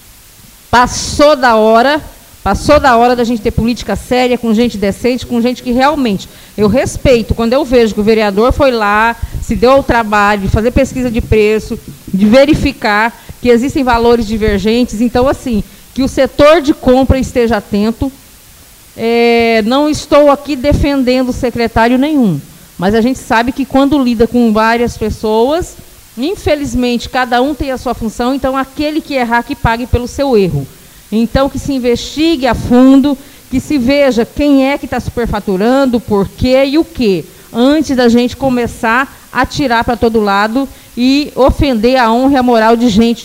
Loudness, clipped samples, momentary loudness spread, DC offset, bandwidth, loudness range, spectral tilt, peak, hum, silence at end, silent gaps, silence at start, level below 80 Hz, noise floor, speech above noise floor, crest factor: -11 LUFS; under 0.1%; 9 LU; under 0.1%; 16.5 kHz; 4 LU; -5.5 dB/octave; 0 dBFS; none; 0 s; none; 0.7 s; -26 dBFS; -38 dBFS; 28 dB; 10 dB